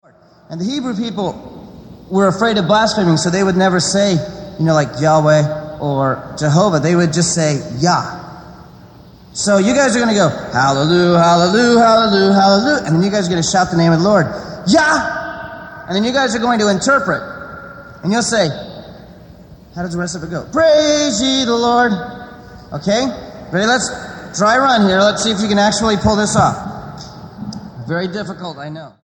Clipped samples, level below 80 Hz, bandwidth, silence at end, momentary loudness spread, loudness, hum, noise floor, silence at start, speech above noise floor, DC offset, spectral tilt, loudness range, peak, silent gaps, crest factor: under 0.1%; -44 dBFS; 17.5 kHz; 0.15 s; 18 LU; -14 LUFS; none; -40 dBFS; 0.5 s; 27 dB; under 0.1%; -4.5 dB/octave; 6 LU; 0 dBFS; none; 14 dB